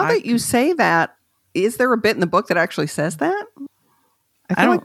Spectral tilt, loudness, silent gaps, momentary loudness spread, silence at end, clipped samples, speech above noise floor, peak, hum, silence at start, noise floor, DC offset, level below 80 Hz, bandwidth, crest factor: -4.5 dB/octave; -19 LUFS; none; 11 LU; 0.05 s; under 0.1%; 46 dB; -2 dBFS; none; 0 s; -64 dBFS; under 0.1%; -60 dBFS; 15.5 kHz; 18 dB